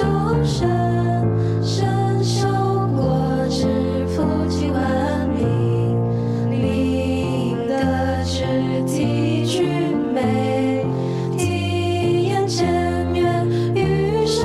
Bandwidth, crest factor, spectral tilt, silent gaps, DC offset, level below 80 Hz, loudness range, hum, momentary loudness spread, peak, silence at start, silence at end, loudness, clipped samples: 12.5 kHz; 12 dB; -6.5 dB/octave; none; under 0.1%; -38 dBFS; 1 LU; none; 2 LU; -6 dBFS; 0 s; 0 s; -20 LUFS; under 0.1%